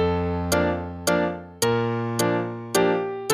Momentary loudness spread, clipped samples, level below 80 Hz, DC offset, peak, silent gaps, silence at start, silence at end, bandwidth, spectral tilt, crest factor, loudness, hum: 4 LU; under 0.1%; -46 dBFS; under 0.1%; -6 dBFS; none; 0 s; 0 s; 15.5 kHz; -4.5 dB/octave; 18 dB; -24 LUFS; none